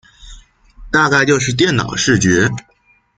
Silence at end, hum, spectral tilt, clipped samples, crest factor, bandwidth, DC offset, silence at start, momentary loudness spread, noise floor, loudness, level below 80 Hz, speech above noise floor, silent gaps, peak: 0.6 s; none; -4 dB/octave; under 0.1%; 16 dB; 9.6 kHz; under 0.1%; 0.25 s; 6 LU; -41 dBFS; -14 LUFS; -42 dBFS; 27 dB; none; -2 dBFS